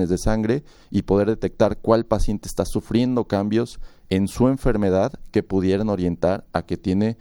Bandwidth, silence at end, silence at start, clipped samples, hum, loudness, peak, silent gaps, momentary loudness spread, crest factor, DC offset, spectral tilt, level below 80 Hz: 17.5 kHz; 0.05 s; 0 s; under 0.1%; none; -22 LUFS; -4 dBFS; none; 6 LU; 18 dB; under 0.1%; -7 dB/octave; -34 dBFS